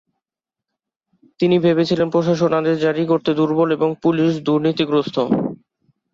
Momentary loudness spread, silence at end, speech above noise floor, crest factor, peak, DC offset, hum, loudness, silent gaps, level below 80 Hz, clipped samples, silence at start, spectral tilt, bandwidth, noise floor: 3 LU; 0.6 s; 70 dB; 14 dB; -4 dBFS; under 0.1%; none; -18 LUFS; none; -60 dBFS; under 0.1%; 1.4 s; -7.5 dB/octave; 7.4 kHz; -86 dBFS